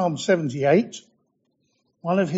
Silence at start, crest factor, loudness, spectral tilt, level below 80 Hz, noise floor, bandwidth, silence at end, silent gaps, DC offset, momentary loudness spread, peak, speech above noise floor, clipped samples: 0 s; 18 dB; -22 LUFS; -5.5 dB/octave; -68 dBFS; -71 dBFS; 8 kHz; 0 s; none; under 0.1%; 14 LU; -6 dBFS; 49 dB; under 0.1%